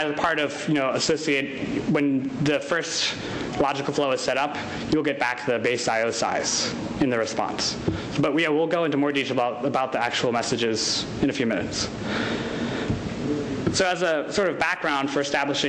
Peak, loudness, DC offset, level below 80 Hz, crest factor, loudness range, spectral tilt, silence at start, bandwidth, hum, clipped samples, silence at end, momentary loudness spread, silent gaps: -12 dBFS; -24 LUFS; under 0.1%; -50 dBFS; 12 dB; 2 LU; -4 dB/octave; 0 s; 11.5 kHz; none; under 0.1%; 0 s; 5 LU; none